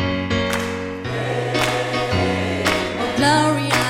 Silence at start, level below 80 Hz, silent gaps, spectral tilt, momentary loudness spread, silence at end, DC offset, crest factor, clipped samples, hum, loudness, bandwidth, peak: 0 s; -44 dBFS; none; -4.5 dB/octave; 8 LU; 0 s; under 0.1%; 18 dB; under 0.1%; none; -20 LUFS; 16.5 kHz; -2 dBFS